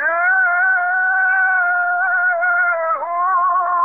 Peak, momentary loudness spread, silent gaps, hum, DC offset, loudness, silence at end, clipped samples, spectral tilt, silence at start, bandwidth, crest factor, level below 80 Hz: -8 dBFS; 3 LU; none; none; 0.2%; -15 LUFS; 0 s; under 0.1%; 1 dB/octave; 0 s; 3.2 kHz; 8 dB; -70 dBFS